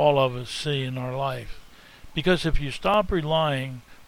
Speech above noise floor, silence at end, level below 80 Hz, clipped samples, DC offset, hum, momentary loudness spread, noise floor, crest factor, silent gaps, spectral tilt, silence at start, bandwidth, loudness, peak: 21 dB; 0.05 s; -36 dBFS; under 0.1%; under 0.1%; none; 10 LU; -46 dBFS; 18 dB; none; -6 dB/octave; 0 s; 16 kHz; -25 LUFS; -8 dBFS